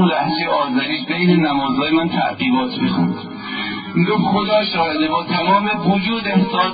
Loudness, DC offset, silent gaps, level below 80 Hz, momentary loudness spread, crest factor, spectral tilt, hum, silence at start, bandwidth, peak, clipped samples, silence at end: -17 LUFS; under 0.1%; none; -54 dBFS; 5 LU; 14 dB; -11.5 dB/octave; none; 0 s; 5 kHz; -4 dBFS; under 0.1%; 0 s